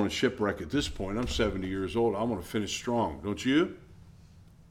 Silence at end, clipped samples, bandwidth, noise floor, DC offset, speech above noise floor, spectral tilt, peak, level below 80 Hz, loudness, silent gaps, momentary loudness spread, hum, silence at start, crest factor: 0.25 s; under 0.1%; 16.5 kHz; -54 dBFS; under 0.1%; 24 dB; -5 dB/octave; -12 dBFS; -46 dBFS; -30 LUFS; none; 6 LU; none; 0 s; 18 dB